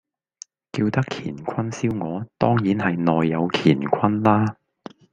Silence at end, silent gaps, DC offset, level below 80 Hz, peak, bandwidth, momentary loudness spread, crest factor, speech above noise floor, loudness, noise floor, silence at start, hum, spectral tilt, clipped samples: 0.6 s; none; under 0.1%; -56 dBFS; -2 dBFS; 9.2 kHz; 9 LU; 20 dB; 26 dB; -22 LUFS; -47 dBFS; 0.75 s; none; -7 dB/octave; under 0.1%